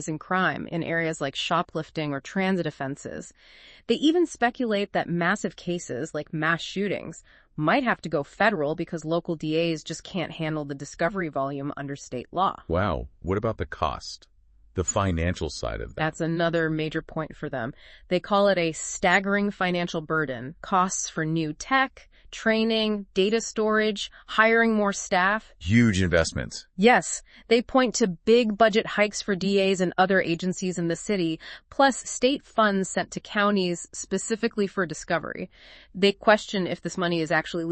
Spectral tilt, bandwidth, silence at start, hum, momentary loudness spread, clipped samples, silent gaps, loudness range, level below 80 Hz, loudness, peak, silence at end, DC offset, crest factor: -4.5 dB/octave; 8.8 kHz; 0 s; none; 12 LU; under 0.1%; none; 6 LU; -50 dBFS; -25 LUFS; -4 dBFS; 0 s; under 0.1%; 22 dB